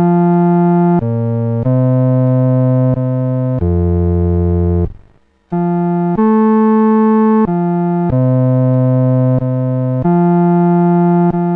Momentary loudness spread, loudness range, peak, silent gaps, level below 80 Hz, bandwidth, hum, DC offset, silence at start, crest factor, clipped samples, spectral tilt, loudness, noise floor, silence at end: 5 LU; 3 LU; -4 dBFS; none; -32 dBFS; 3.1 kHz; none; under 0.1%; 0 s; 8 dB; under 0.1%; -13 dB/octave; -13 LUFS; -48 dBFS; 0 s